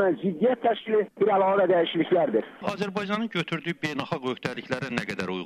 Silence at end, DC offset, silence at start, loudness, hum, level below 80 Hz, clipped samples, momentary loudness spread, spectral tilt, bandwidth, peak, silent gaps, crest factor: 0 s; under 0.1%; 0 s; -26 LUFS; none; -66 dBFS; under 0.1%; 9 LU; -6.5 dB/octave; 12.5 kHz; -6 dBFS; none; 20 dB